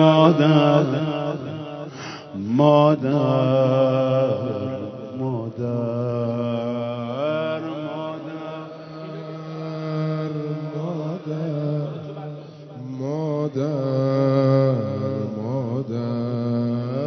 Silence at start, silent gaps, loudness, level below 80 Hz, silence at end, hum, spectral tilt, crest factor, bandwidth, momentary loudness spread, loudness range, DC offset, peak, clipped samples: 0 s; none; -22 LUFS; -62 dBFS; 0 s; none; -8.5 dB/octave; 20 dB; 6.4 kHz; 17 LU; 9 LU; under 0.1%; 0 dBFS; under 0.1%